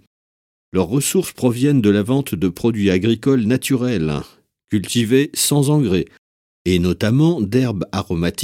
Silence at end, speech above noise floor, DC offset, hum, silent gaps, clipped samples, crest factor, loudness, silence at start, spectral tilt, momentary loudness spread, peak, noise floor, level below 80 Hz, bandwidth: 0 s; over 73 dB; under 0.1%; none; 6.18-6.65 s; under 0.1%; 16 dB; -18 LUFS; 0.75 s; -5.5 dB/octave; 8 LU; -2 dBFS; under -90 dBFS; -46 dBFS; 16.5 kHz